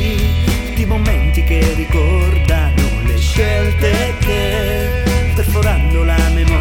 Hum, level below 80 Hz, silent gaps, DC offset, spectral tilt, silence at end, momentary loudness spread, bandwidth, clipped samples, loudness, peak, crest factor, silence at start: none; -14 dBFS; none; under 0.1%; -6 dB/octave; 0 s; 3 LU; 17 kHz; under 0.1%; -15 LUFS; 0 dBFS; 12 dB; 0 s